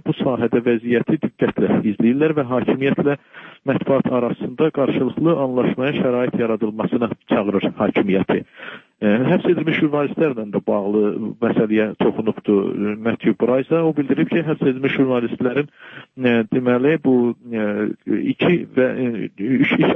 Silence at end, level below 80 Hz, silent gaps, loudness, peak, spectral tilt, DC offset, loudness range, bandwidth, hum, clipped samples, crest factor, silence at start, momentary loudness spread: 0 s; -60 dBFS; none; -19 LUFS; -4 dBFS; -10 dB/octave; under 0.1%; 1 LU; 3.9 kHz; none; under 0.1%; 14 dB; 0.05 s; 6 LU